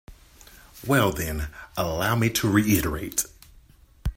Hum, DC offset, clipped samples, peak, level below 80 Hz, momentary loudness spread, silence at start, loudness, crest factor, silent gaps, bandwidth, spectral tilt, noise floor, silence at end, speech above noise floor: none; under 0.1%; under 0.1%; -6 dBFS; -40 dBFS; 13 LU; 0.1 s; -24 LUFS; 20 dB; none; 16.5 kHz; -4.5 dB/octave; -53 dBFS; 0.05 s; 30 dB